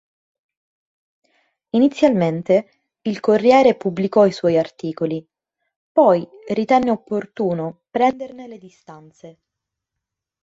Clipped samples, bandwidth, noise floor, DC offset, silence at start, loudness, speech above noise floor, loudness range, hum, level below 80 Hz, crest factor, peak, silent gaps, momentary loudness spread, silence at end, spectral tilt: under 0.1%; 7.8 kHz; -83 dBFS; under 0.1%; 1.75 s; -18 LUFS; 65 dB; 6 LU; none; -62 dBFS; 18 dB; -2 dBFS; 5.76-5.95 s; 12 LU; 1.1 s; -7 dB/octave